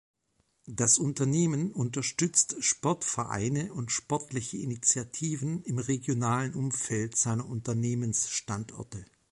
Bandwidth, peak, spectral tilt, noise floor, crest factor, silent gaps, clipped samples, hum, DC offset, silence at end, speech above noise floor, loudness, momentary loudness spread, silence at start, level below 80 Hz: 11.5 kHz; -8 dBFS; -4 dB/octave; -74 dBFS; 22 dB; none; under 0.1%; none; under 0.1%; 0.25 s; 44 dB; -29 LUFS; 10 LU; 0.65 s; -62 dBFS